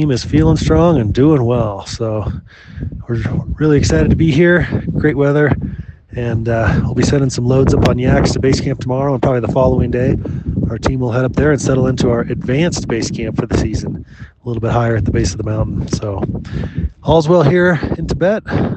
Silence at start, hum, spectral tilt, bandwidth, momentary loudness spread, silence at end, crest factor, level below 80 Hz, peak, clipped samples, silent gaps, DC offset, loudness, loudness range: 0 s; none; -7 dB/octave; 8.8 kHz; 10 LU; 0 s; 14 dB; -28 dBFS; 0 dBFS; under 0.1%; none; under 0.1%; -15 LUFS; 4 LU